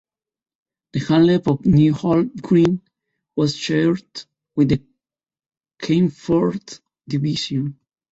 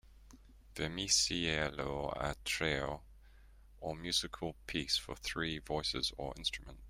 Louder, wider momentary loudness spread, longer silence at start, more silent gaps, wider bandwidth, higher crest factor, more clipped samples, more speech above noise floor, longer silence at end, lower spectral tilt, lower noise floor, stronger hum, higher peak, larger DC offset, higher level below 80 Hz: first, -19 LUFS vs -36 LUFS; first, 15 LU vs 12 LU; first, 0.95 s vs 0.1 s; neither; second, 8 kHz vs 16 kHz; second, 16 dB vs 22 dB; neither; first, over 72 dB vs 22 dB; first, 0.4 s vs 0 s; first, -7 dB/octave vs -2.5 dB/octave; first, under -90 dBFS vs -59 dBFS; neither; first, -4 dBFS vs -18 dBFS; neither; first, -48 dBFS vs -54 dBFS